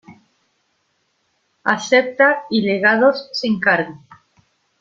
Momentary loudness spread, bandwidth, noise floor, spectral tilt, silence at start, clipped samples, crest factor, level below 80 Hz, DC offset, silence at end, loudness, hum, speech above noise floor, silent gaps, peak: 9 LU; 7.6 kHz; -67 dBFS; -4.5 dB/octave; 0.1 s; under 0.1%; 20 dB; -64 dBFS; under 0.1%; 0.85 s; -16 LUFS; none; 50 dB; none; 0 dBFS